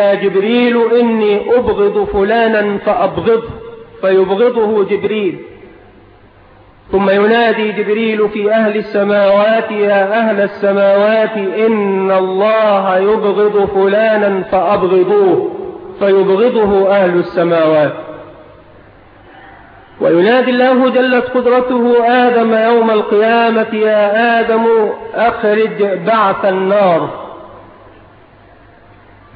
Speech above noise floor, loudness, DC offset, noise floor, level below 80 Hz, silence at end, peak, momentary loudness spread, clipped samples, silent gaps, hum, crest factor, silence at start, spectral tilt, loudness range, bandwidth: 31 dB; -12 LUFS; under 0.1%; -42 dBFS; -46 dBFS; 1.75 s; 0 dBFS; 5 LU; under 0.1%; none; none; 12 dB; 0 s; -9 dB/octave; 5 LU; 5 kHz